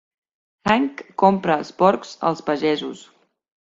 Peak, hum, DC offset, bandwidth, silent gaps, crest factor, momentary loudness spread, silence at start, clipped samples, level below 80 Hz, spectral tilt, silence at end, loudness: -2 dBFS; none; under 0.1%; 7.8 kHz; none; 20 dB; 9 LU; 0.65 s; under 0.1%; -60 dBFS; -6 dB/octave; 0.7 s; -20 LUFS